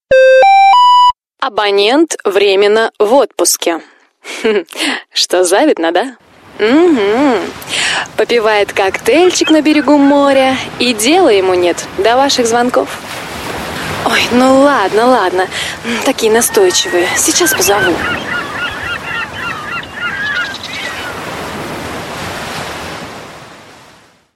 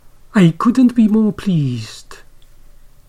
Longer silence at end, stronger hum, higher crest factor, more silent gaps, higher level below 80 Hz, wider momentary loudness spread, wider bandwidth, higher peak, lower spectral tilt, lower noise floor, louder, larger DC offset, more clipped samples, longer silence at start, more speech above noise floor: second, 0.75 s vs 0.95 s; neither; about the same, 12 dB vs 14 dB; neither; about the same, -44 dBFS vs -42 dBFS; about the same, 14 LU vs 15 LU; first, 16 kHz vs 11 kHz; about the same, 0 dBFS vs -2 dBFS; second, -2.5 dB/octave vs -7.5 dB/octave; first, -44 dBFS vs -40 dBFS; first, -11 LUFS vs -14 LUFS; neither; neither; second, 0.1 s vs 0.35 s; first, 33 dB vs 27 dB